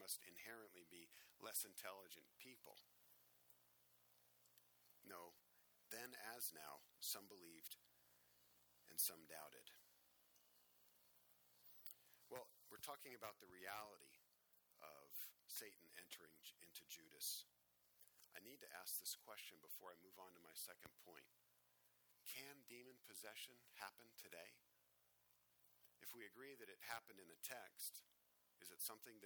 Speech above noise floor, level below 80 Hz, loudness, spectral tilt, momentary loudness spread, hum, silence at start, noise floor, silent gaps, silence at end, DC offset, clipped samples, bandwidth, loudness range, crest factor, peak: 24 dB; under -90 dBFS; -55 LUFS; 0 dB/octave; 15 LU; 60 Hz at -100 dBFS; 0 s; -81 dBFS; none; 0 s; under 0.1%; under 0.1%; over 20 kHz; 9 LU; 32 dB; -28 dBFS